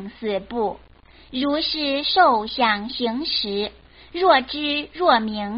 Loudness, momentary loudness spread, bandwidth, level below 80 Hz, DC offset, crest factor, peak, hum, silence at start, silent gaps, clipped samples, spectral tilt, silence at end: -21 LUFS; 10 LU; 5.6 kHz; -52 dBFS; under 0.1%; 20 dB; -2 dBFS; none; 0 s; none; under 0.1%; -1 dB/octave; 0 s